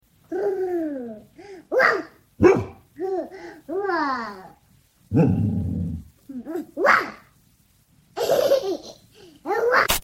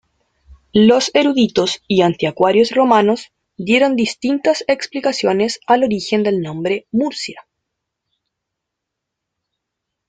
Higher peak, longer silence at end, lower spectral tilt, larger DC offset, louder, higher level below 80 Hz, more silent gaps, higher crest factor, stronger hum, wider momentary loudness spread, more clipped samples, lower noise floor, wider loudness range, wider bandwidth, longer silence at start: about the same, -2 dBFS vs 0 dBFS; second, 0 s vs 2.7 s; about the same, -5.5 dB/octave vs -5 dB/octave; neither; second, -23 LUFS vs -16 LUFS; first, -48 dBFS vs -56 dBFS; neither; first, 22 dB vs 16 dB; neither; first, 20 LU vs 8 LU; neither; second, -60 dBFS vs -80 dBFS; second, 3 LU vs 10 LU; first, 16.5 kHz vs 9.4 kHz; second, 0.3 s vs 0.75 s